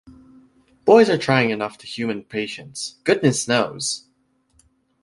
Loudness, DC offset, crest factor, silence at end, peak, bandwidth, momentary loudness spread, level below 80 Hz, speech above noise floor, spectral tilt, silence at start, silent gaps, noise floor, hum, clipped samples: -20 LUFS; under 0.1%; 20 dB; 1.05 s; -2 dBFS; 11.5 kHz; 15 LU; -60 dBFS; 44 dB; -4.5 dB/octave; 0.85 s; none; -64 dBFS; none; under 0.1%